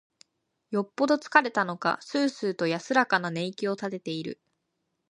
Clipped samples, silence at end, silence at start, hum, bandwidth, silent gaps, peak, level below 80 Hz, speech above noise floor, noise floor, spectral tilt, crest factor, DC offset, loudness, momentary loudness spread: under 0.1%; 0.75 s; 0.7 s; none; 11 kHz; none; -4 dBFS; -78 dBFS; 52 dB; -79 dBFS; -5 dB/octave; 24 dB; under 0.1%; -27 LUFS; 11 LU